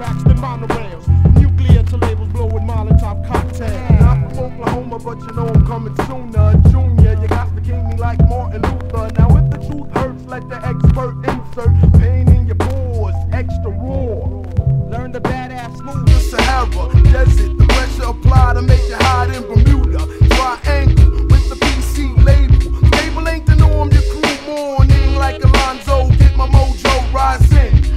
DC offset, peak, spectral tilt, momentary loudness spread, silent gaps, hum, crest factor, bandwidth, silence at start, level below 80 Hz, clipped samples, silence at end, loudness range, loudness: under 0.1%; 0 dBFS; -7 dB/octave; 10 LU; none; none; 12 dB; 13 kHz; 0 s; -14 dBFS; 0.8%; 0 s; 4 LU; -14 LUFS